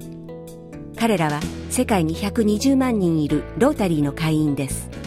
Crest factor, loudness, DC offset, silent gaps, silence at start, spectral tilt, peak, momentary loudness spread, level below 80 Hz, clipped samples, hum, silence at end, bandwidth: 16 dB; -21 LUFS; under 0.1%; none; 0 s; -6 dB/octave; -4 dBFS; 18 LU; -40 dBFS; under 0.1%; none; 0 s; 16 kHz